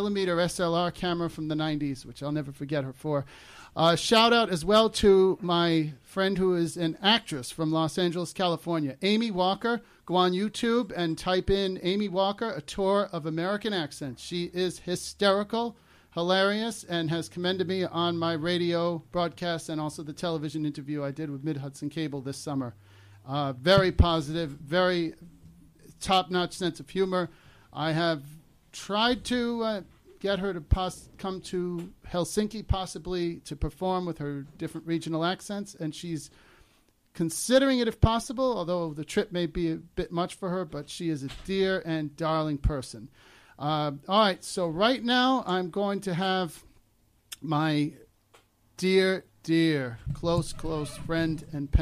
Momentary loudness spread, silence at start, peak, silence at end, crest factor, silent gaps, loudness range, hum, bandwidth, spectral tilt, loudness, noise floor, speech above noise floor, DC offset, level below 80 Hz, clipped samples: 12 LU; 0 s; -10 dBFS; 0 s; 18 dB; none; 7 LU; none; 15 kHz; -5 dB/octave; -28 LUFS; -66 dBFS; 38 dB; under 0.1%; -44 dBFS; under 0.1%